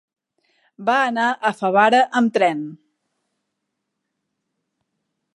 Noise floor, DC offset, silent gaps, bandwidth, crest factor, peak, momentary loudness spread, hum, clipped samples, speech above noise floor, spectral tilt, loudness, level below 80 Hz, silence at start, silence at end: -78 dBFS; under 0.1%; none; 11.5 kHz; 20 dB; -2 dBFS; 11 LU; none; under 0.1%; 60 dB; -5 dB/octave; -18 LUFS; -78 dBFS; 0.8 s; 2.6 s